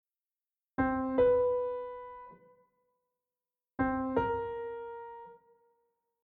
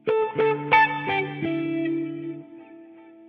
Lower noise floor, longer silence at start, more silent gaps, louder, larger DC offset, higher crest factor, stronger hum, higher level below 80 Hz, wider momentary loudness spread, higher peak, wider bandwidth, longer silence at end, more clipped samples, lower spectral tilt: first, under -90 dBFS vs -47 dBFS; first, 0.8 s vs 0.05 s; neither; second, -32 LUFS vs -23 LUFS; neither; about the same, 18 dB vs 20 dB; neither; first, -58 dBFS vs -70 dBFS; first, 21 LU vs 15 LU; second, -16 dBFS vs -6 dBFS; second, 4 kHz vs 6.2 kHz; first, 0.9 s vs 0 s; neither; about the same, -6.5 dB/octave vs -7.5 dB/octave